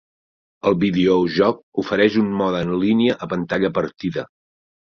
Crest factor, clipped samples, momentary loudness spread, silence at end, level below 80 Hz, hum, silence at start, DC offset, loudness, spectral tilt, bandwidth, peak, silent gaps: 18 dB; under 0.1%; 9 LU; 0.7 s; -52 dBFS; none; 0.65 s; under 0.1%; -19 LUFS; -7.5 dB/octave; 6.8 kHz; -2 dBFS; 1.63-1.72 s